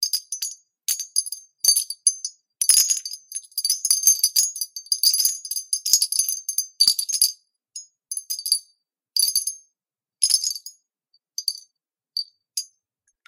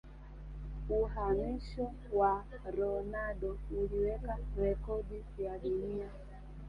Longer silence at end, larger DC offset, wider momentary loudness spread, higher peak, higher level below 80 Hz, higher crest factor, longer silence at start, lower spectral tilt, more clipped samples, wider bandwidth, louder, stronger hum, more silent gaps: first, 0.6 s vs 0 s; neither; about the same, 16 LU vs 15 LU; first, 0 dBFS vs -20 dBFS; second, -78 dBFS vs -44 dBFS; first, 24 dB vs 16 dB; about the same, 0 s vs 0.05 s; second, 6 dB/octave vs -9 dB/octave; neither; first, 17 kHz vs 5.4 kHz; first, -20 LUFS vs -37 LUFS; neither; neither